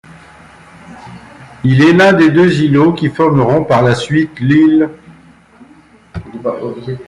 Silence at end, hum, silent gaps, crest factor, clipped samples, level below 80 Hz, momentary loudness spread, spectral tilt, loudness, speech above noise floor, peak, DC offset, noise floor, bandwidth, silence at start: 0.05 s; none; none; 12 dB; under 0.1%; -46 dBFS; 15 LU; -7.5 dB/octave; -11 LUFS; 33 dB; 0 dBFS; under 0.1%; -43 dBFS; 11 kHz; 0.9 s